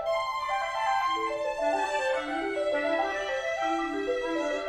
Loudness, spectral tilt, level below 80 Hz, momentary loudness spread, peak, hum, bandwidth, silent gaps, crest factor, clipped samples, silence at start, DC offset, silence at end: -29 LUFS; -2.5 dB/octave; -58 dBFS; 3 LU; -16 dBFS; none; 15.5 kHz; none; 14 dB; under 0.1%; 0 s; under 0.1%; 0 s